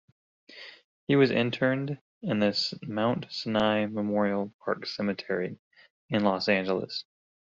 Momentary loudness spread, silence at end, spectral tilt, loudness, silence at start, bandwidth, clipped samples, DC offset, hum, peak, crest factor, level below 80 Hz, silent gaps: 13 LU; 0.5 s; -4 dB/octave; -28 LUFS; 0.5 s; 7.6 kHz; under 0.1%; under 0.1%; none; -10 dBFS; 20 dB; -66 dBFS; 0.84-1.07 s, 2.01-2.21 s, 4.54-4.59 s, 5.59-5.71 s, 5.90-6.09 s